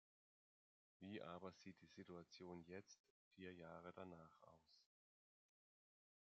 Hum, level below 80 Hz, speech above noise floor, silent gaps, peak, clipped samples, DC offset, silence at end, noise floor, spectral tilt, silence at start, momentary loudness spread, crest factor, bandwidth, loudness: none; under -90 dBFS; over 30 dB; 3.00-3.04 s, 3.10-3.31 s; -40 dBFS; under 0.1%; under 0.1%; 1.5 s; under -90 dBFS; -5 dB/octave; 1 s; 8 LU; 22 dB; 7.4 kHz; -60 LUFS